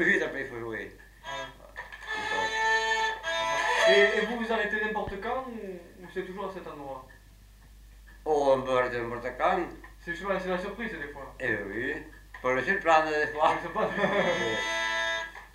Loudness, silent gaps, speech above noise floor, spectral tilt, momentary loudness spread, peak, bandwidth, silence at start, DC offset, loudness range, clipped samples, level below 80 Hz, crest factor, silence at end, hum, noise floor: -28 LUFS; none; 24 dB; -3.5 dB/octave; 17 LU; -8 dBFS; 16 kHz; 0 s; under 0.1%; 7 LU; under 0.1%; -54 dBFS; 22 dB; 0.05 s; none; -53 dBFS